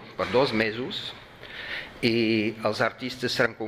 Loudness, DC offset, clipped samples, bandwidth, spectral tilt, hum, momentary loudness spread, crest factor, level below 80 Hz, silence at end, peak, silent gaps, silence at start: -26 LUFS; under 0.1%; under 0.1%; 15.5 kHz; -5 dB/octave; none; 14 LU; 20 dB; -58 dBFS; 0 s; -8 dBFS; none; 0 s